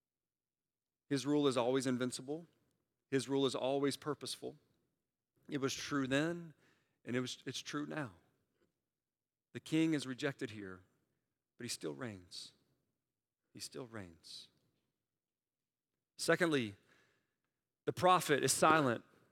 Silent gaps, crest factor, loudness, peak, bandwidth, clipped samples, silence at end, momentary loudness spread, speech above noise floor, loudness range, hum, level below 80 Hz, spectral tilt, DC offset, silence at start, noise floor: none; 26 dB; -37 LUFS; -14 dBFS; 17 kHz; under 0.1%; 0.3 s; 19 LU; over 53 dB; 13 LU; none; -82 dBFS; -4 dB/octave; under 0.1%; 1.1 s; under -90 dBFS